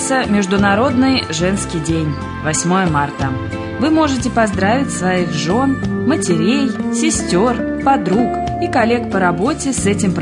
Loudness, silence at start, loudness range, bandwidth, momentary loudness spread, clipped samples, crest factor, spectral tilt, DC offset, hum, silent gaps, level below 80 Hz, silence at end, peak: -16 LUFS; 0 s; 1 LU; 11 kHz; 5 LU; under 0.1%; 12 dB; -5 dB/octave; under 0.1%; none; none; -38 dBFS; 0 s; -2 dBFS